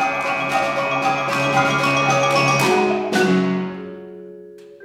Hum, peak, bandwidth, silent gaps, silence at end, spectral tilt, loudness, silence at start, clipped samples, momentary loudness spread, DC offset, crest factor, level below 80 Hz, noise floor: none; -6 dBFS; 16.5 kHz; none; 0 s; -4.5 dB/octave; -18 LUFS; 0 s; under 0.1%; 18 LU; under 0.1%; 14 dB; -56 dBFS; -40 dBFS